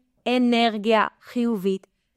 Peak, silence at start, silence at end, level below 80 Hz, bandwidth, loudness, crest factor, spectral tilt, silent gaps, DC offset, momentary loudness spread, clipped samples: -6 dBFS; 0.25 s; 0.4 s; -70 dBFS; 14 kHz; -23 LUFS; 16 dB; -5.5 dB/octave; none; under 0.1%; 7 LU; under 0.1%